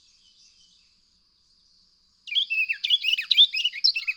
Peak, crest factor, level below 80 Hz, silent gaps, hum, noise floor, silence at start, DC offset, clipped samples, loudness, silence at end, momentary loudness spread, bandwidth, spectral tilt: -6 dBFS; 20 dB; -76 dBFS; none; none; -64 dBFS; 2.25 s; under 0.1%; under 0.1%; -20 LUFS; 0 s; 8 LU; 19.5 kHz; 5.5 dB/octave